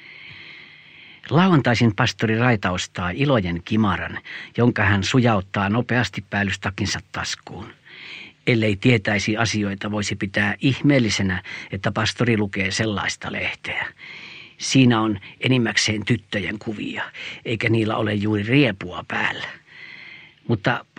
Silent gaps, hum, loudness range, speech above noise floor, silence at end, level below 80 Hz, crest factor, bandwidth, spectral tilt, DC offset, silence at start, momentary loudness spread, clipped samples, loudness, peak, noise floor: none; none; 3 LU; 25 dB; 0.15 s; -52 dBFS; 20 dB; 10 kHz; -5 dB/octave; under 0.1%; 0 s; 19 LU; under 0.1%; -21 LUFS; -2 dBFS; -46 dBFS